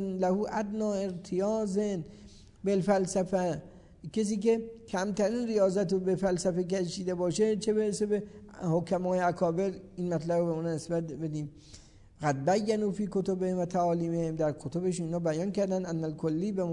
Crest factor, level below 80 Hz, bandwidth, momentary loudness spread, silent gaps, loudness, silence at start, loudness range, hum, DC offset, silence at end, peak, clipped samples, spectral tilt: 16 dB; -60 dBFS; 11 kHz; 7 LU; none; -31 LUFS; 0 s; 2 LU; none; under 0.1%; 0 s; -14 dBFS; under 0.1%; -6.5 dB/octave